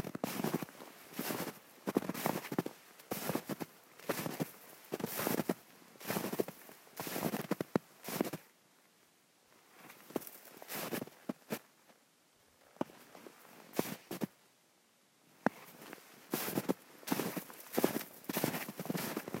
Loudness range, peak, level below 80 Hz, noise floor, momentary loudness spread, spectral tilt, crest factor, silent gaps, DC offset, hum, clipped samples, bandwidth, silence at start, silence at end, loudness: 7 LU; -10 dBFS; -82 dBFS; -70 dBFS; 16 LU; -4.5 dB/octave; 32 dB; none; under 0.1%; none; under 0.1%; 16 kHz; 0 s; 0 s; -40 LUFS